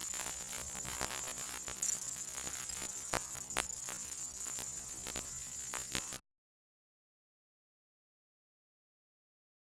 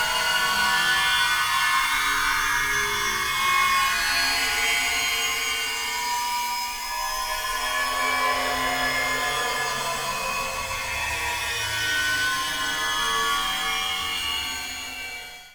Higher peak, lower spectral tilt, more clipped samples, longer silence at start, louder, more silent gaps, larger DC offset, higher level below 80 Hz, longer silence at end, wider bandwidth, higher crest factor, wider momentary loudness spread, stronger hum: about the same, -10 dBFS vs -10 dBFS; about the same, -0.5 dB/octave vs 0 dB/octave; neither; about the same, 0 s vs 0 s; second, -39 LUFS vs -23 LUFS; neither; second, under 0.1% vs 0.1%; second, -62 dBFS vs -46 dBFS; first, 3.5 s vs 0 s; second, 17.5 kHz vs over 20 kHz; first, 34 dB vs 16 dB; about the same, 5 LU vs 7 LU; neither